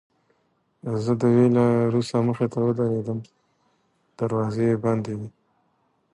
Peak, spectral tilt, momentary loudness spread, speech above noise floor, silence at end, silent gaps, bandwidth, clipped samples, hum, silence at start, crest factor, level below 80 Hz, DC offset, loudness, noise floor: -8 dBFS; -8.5 dB/octave; 14 LU; 47 dB; 0.85 s; none; 11 kHz; under 0.1%; none; 0.85 s; 16 dB; -60 dBFS; under 0.1%; -23 LUFS; -69 dBFS